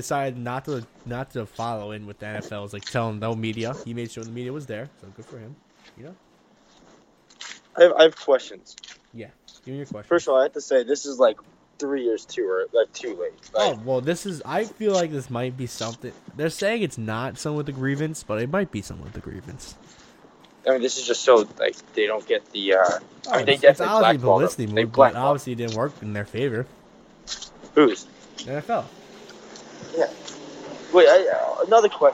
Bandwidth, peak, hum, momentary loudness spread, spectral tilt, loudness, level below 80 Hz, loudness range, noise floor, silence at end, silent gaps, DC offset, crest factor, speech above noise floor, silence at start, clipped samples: 16 kHz; 0 dBFS; none; 21 LU; -4.5 dB/octave; -22 LUFS; -60 dBFS; 11 LU; -57 dBFS; 0 s; none; under 0.1%; 22 dB; 34 dB; 0 s; under 0.1%